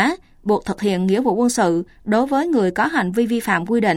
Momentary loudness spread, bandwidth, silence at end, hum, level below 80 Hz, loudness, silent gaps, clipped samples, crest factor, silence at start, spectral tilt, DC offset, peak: 4 LU; 16.5 kHz; 0 s; none; -50 dBFS; -19 LUFS; none; under 0.1%; 14 dB; 0 s; -5.5 dB/octave; under 0.1%; -4 dBFS